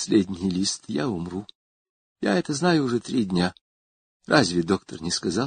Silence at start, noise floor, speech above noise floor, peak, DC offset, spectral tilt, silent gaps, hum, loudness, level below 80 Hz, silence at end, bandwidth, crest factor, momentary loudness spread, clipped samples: 0 s; under -90 dBFS; over 66 dB; -4 dBFS; under 0.1%; -4.5 dB/octave; 1.55-2.16 s, 3.61-4.20 s; none; -24 LUFS; -52 dBFS; 0 s; 9.6 kHz; 22 dB; 7 LU; under 0.1%